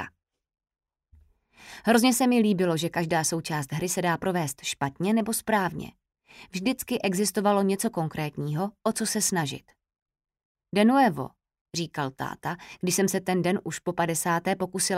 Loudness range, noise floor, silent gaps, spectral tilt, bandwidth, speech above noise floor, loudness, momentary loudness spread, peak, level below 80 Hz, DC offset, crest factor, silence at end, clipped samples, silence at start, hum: 3 LU; -60 dBFS; 10.02-10.06 s, 10.45-10.55 s, 11.61-11.65 s; -4.5 dB/octave; 16 kHz; 34 dB; -26 LUFS; 12 LU; -8 dBFS; -62 dBFS; under 0.1%; 20 dB; 0 s; under 0.1%; 0 s; none